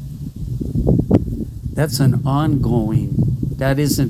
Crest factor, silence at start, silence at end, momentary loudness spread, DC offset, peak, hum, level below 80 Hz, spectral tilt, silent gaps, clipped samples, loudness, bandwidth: 16 dB; 0 s; 0 s; 10 LU; under 0.1%; -2 dBFS; none; -30 dBFS; -7 dB/octave; none; under 0.1%; -18 LUFS; 16 kHz